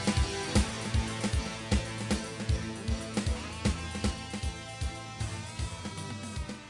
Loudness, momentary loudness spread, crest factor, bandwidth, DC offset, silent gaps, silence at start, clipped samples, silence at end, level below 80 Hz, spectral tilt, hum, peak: -34 LUFS; 8 LU; 20 dB; 11.5 kHz; under 0.1%; none; 0 s; under 0.1%; 0 s; -38 dBFS; -4.5 dB/octave; none; -12 dBFS